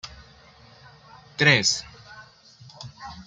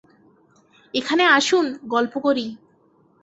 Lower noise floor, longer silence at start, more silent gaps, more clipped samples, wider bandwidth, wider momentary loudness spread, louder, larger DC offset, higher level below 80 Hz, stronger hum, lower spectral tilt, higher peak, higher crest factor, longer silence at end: second, -52 dBFS vs -58 dBFS; second, 0.05 s vs 0.95 s; neither; neither; first, 9.6 kHz vs 8.2 kHz; first, 27 LU vs 12 LU; about the same, -20 LUFS vs -20 LUFS; neither; first, -58 dBFS vs -68 dBFS; neither; about the same, -2.5 dB/octave vs -2.5 dB/octave; about the same, -4 dBFS vs -2 dBFS; about the same, 24 dB vs 20 dB; second, 0.05 s vs 0.65 s